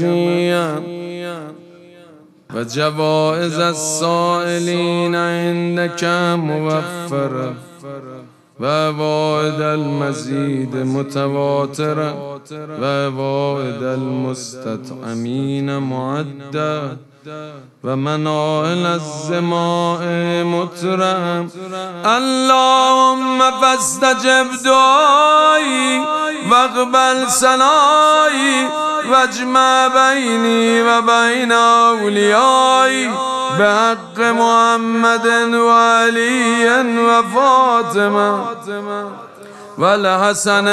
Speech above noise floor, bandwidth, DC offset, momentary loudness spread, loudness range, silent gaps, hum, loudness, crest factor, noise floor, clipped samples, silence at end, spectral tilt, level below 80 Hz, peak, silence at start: 29 dB; 14 kHz; under 0.1%; 14 LU; 9 LU; none; none; -14 LUFS; 14 dB; -44 dBFS; under 0.1%; 0 s; -4 dB/octave; -66 dBFS; 0 dBFS; 0 s